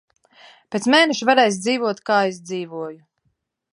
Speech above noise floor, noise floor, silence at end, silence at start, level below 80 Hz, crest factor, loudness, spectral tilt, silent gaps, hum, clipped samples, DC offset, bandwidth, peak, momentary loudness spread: 52 dB; -71 dBFS; 0.8 s; 0.7 s; -76 dBFS; 20 dB; -19 LUFS; -3.5 dB/octave; none; none; under 0.1%; under 0.1%; 11.5 kHz; -2 dBFS; 15 LU